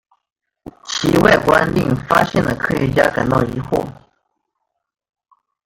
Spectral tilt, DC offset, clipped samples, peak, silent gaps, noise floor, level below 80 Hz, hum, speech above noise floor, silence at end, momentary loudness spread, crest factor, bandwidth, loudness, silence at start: -5.5 dB/octave; under 0.1%; under 0.1%; 0 dBFS; none; -75 dBFS; -40 dBFS; none; 59 dB; 1.75 s; 10 LU; 18 dB; 17 kHz; -16 LUFS; 0.65 s